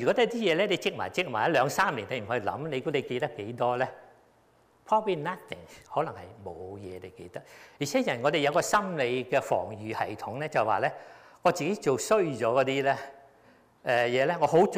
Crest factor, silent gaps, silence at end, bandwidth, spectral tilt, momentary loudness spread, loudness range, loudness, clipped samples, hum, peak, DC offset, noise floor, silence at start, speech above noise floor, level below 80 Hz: 16 dB; none; 0 s; 15.5 kHz; -4.5 dB/octave; 16 LU; 6 LU; -28 LUFS; under 0.1%; none; -12 dBFS; under 0.1%; -63 dBFS; 0 s; 35 dB; -68 dBFS